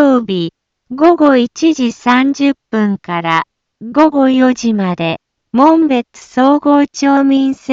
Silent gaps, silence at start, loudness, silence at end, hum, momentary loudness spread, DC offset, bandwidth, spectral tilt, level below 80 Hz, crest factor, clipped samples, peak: none; 0 s; -12 LUFS; 0 s; none; 10 LU; under 0.1%; 7.6 kHz; -5.5 dB/octave; -56 dBFS; 12 dB; under 0.1%; 0 dBFS